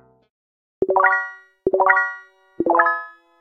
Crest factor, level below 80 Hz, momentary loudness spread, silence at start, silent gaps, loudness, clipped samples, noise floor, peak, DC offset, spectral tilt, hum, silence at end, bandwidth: 22 dB; -58 dBFS; 14 LU; 0.8 s; none; -19 LUFS; under 0.1%; -40 dBFS; 0 dBFS; under 0.1%; -7 dB/octave; none; 0.3 s; 6 kHz